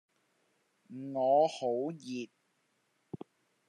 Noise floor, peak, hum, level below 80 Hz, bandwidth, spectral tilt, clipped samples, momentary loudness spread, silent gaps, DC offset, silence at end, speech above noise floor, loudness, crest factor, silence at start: -76 dBFS; -16 dBFS; none; under -90 dBFS; 10.5 kHz; -6 dB/octave; under 0.1%; 21 LU; none; under 0.1%; 0.5 s; 45 dB; -32 LUFS; 20 dB; 0.9 s